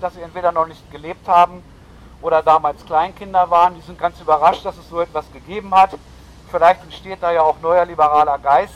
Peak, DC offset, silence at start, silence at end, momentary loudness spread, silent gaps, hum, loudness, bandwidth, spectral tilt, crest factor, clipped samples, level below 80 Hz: -2 dBFS; under 0.1%; 0 s; 0 s; 14 LU; none; none; -16 LUFS; 12 kHz; -5.5 dB/octave; 14 dB; under 0.1%; -46 dBFS